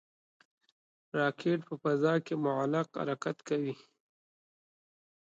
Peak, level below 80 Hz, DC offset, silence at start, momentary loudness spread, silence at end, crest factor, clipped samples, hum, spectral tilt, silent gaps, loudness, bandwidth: -16 dBFS; -82 dBFS; under 0.1%; 1.15 s; 7 LU; 1.55 s; 18 dB; under 0.1%; none; -7 dB/octave; none; -33 LUFS; 8.6 kHz